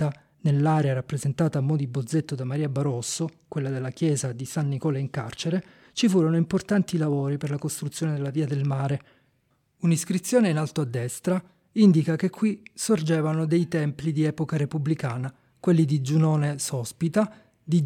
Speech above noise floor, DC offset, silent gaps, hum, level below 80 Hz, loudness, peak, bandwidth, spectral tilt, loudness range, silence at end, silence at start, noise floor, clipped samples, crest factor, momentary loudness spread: 45 dB; under 0.1%; none; none; -64 dBFS; -25 LUFS; -8 dBFS; 15 kHz; -6.5 dB/octave; 4 LU; 0 s; 0 s; -69 dBFS; under 0.1%; 16 dB; 8 LU